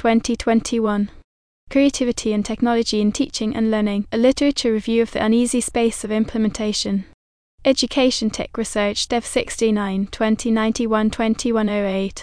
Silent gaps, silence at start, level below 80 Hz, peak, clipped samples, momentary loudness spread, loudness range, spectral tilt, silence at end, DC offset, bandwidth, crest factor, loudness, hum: 1.24-1.67 s, 7.14-7.58 s; 0 s; -42 dBFS; -2 dBFS; under 0.1%; 5 LU; 2 LU; -4.5 dB/octave; 0 s; under 0.1%; 10.5 kHz; 16 dB; -20 LUFS; none